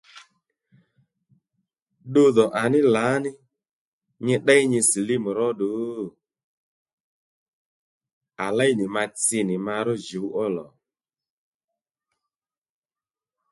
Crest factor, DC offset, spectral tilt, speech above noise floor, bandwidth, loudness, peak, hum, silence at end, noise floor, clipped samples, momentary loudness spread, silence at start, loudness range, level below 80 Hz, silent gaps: 22 dB; under 0.1%; -4 dB/octave; over 68 dB; 12 kHz; -22 LUFS; -4 dBFS; none; 2.85 s; under -90 dBFS; under 0.1%; 13 LU; 0.15 s; 11 LU; -70 dBFS; 1.82-1.86 s, 3.73-4.01 s, 6.44-6.86 s, 6.93-8.01 s, 8.13-8.21 s